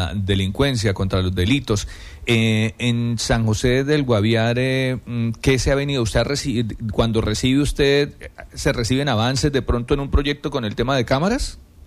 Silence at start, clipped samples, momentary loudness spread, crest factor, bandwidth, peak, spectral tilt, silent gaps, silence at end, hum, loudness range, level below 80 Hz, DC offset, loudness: 0 s; under 0.1%; 6 LU; 14 dB; 14.5 kHz; -6 dBFS; -5.5 dB/octave; none; 0.25 s; none; 1 LU; -32 dBFS; under 0.1%; -20 LUFS